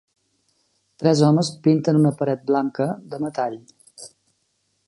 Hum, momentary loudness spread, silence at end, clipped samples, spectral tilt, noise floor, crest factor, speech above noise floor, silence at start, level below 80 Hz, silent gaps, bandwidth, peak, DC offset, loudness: none; 24 LU; 0.8 s; under 0.1%; -7 dB/octave; -70 dBFS; 18 dB; 50 dB; 1 s; -66 dBFS; none; 11.5 kHz; -4 dBFS; under 0.1%; -21 LUFS